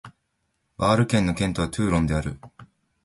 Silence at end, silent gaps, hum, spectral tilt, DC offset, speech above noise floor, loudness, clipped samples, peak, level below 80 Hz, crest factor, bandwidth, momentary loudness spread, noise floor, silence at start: 0.4 s; none; none; -6 dB/octave; under 0.1%; 51 dB; -23 LUFS; under 0.1%; -8 dBFS; -40 dBFS; 18 dB; 11.5 kHz; 9 LU; -74 dBFS; 0.05 s